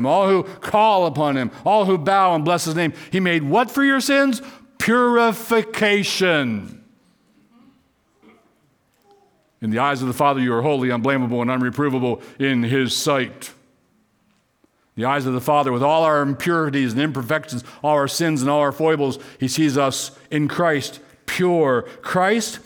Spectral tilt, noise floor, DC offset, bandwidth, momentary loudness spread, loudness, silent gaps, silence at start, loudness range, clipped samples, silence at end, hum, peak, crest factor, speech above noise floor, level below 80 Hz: -5 dB/octave; -63 dBFS; under 0.1%; over 20 kHz; 9 LU; -19 LUFS; none; 0 s; 6 LU; under 0.1%; 0.05 s; none; -6 dBFS; 14 dB; 44 dB; -62 dBFS